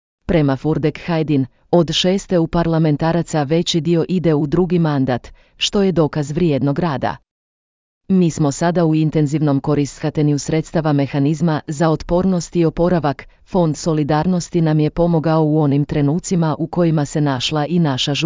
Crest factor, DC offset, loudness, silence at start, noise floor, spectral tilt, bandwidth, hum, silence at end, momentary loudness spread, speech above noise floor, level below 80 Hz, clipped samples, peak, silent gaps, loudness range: 14 dB; under 0.1%; -17 LUFS; 0.3 s; under -90 dBFS; -6.5 dB/octave; 7.6 kHz; none; 0 s; 4 LU; over 74 dB; -40 dBFS; under 0.1%; -2 dBFS; 7.31-8.01 s; 2 LU